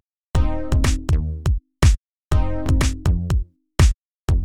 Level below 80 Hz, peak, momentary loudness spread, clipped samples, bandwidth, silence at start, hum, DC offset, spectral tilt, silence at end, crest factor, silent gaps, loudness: -22 dBFS; -2 dBFS; 6 LU; under 0.1%; 14 kHz; 0 s; none; under 0.1%; -6 dB/octave; 0 s; 18 dB; 0.03-0.24 s, 0.30-0.34 s, 1.98-2.06 s, 2.12-2.29 s, 3.96-4.26 s; -22 LUFS